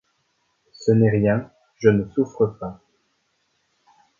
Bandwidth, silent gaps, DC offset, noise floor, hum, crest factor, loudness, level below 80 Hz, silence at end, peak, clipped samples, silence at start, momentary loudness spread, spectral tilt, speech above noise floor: 7.4 kHz; none; under 0.1%; -69 dBFS; none; 20 dB; -21 LUFS; -54 dBFS; 1.45 s; -2 dBFS; under 0.1%; 0.8 s; 17 LU; -8.5 dB/octave; 50 dB